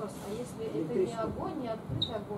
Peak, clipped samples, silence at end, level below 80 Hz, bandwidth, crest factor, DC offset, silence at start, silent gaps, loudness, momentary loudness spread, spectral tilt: -18 dBFS; under 0.1%; 0 s; -56 dBFS; 15.5 kHz; 16 dB; under 0.1%; 0 s; none; -35 LUFS; 7 LU; -6 dB/octave